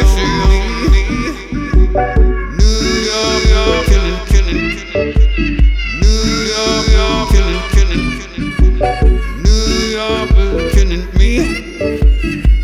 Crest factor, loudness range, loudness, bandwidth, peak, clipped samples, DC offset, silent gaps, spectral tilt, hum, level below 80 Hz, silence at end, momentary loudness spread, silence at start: 10 dB; 1 LU; -14 LUFS; 10.5 kHz; 0 dBFS; under 0.1%; under 0.1%; none; -5 dB/octave; none; -12 dBFS; 0 s; 5 LU; 0 s